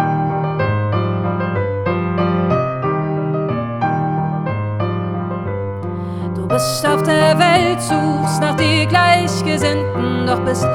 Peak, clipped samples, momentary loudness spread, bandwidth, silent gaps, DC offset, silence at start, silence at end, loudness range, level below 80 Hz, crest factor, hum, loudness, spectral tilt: 0 dBFS; under 0.1%; 10 LU; 18 kHz; none; under 0.1%; 0 s; 0 s; 6 LU; -48 dBFS; 16 dB; none; -17 LUFS; -5.5 dB/octave